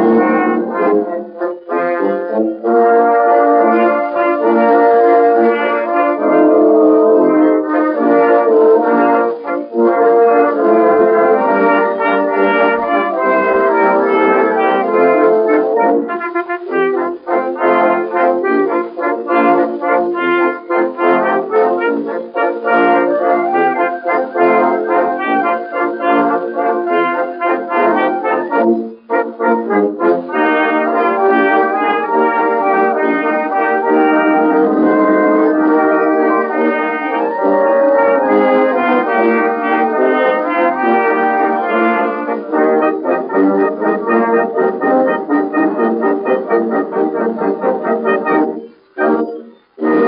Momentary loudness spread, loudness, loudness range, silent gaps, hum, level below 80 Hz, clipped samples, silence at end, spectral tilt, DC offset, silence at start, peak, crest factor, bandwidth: 7 LU; -13 LUFS; 4 LU; none; none; -66 dBFS; under 0.1%; 0 s; -4 dB/octave; under 0.1%; 0 s; 0 dBFS; 12 dB; 5.2 kHz